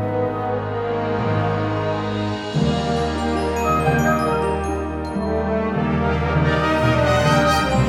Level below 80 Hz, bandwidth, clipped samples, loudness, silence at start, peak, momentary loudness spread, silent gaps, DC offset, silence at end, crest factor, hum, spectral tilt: -32 dBFS; 16 kHz; under 0.1%; -20 LUFS; 0 s; -6 dBFS; 7 LU; none; under 0.1%; 0 s; 14 dB; none; -6.5 dB/octave